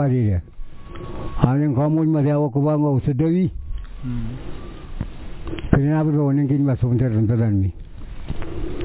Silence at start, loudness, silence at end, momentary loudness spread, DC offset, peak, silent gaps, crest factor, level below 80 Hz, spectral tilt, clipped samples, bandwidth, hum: 0 s; -20 LUFS; 0 s; 18 LU; under 0.1%; 0 dBFS; none; 20 dB; -34 dBFS; -13 dB/octave; under 0.1%; 4 kHz; none